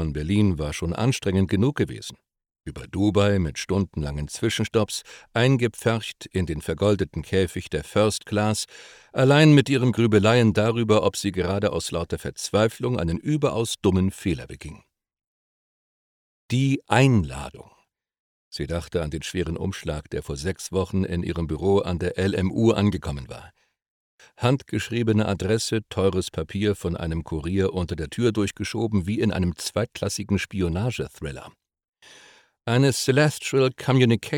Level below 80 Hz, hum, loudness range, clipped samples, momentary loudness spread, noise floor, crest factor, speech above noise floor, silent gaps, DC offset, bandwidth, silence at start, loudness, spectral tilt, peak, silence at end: -44 dBFS; none; 8 LU; under 0.1%; 12 LU; -54 dBFS; 22 dB; 31 dB; 15.27-16.49 s, 18.19-18.52 s, 23.90-24.18 s, 31.88-31.93 s; under 0.1%; 18 kHz; 0 s; -23 LUFS; -6 dB/octave; -2 dBFS; 0 s